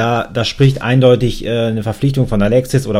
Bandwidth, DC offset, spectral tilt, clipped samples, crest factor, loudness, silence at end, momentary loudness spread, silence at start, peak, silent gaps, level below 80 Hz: 14.5 kHz; under 0.1%; -7 dB/octave; under 0.1%; 14 dB; -14 LUFS; 0 s; 6 LU; 0 s; 0 dBFS; none; -30 dBFS